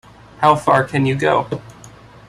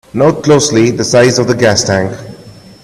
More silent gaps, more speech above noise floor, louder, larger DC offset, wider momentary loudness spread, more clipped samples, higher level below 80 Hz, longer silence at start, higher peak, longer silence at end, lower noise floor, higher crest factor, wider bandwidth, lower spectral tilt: neither; about the same, 26 dB vs 25 dB; second, -16 LUFS vs -10 LUFS; neither; first, 10 LU vs 6 LU; neither; second, -50 dBFS vs -44 dBFS; first, 0.4 s vs 0.15 s; about the same, -2 dBFS vs 0 dBFS; about the same, 0.4 s vs 0.35 s; first, -41 dBFS vs -35 dBFS; first, 16 dB vs 10 dB; about the same, 13 kHz vs 13.5 kHz; first, -6.5 dB/octave vs -4.5 dB/octave